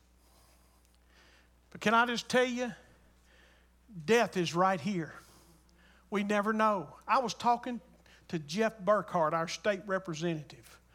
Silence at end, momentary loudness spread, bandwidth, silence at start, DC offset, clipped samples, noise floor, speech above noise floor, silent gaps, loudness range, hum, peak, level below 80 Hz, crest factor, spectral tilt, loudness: 0.4 s; 13 LU; 16 kHz; 1.75 s; under 0.1%; under 0.1%; -64 dBFS; 33 dB; none; 2 LU; none; -12 dBFS; -66 dBFS; 20 dB; -4.5 dB/octave; -31 LUFS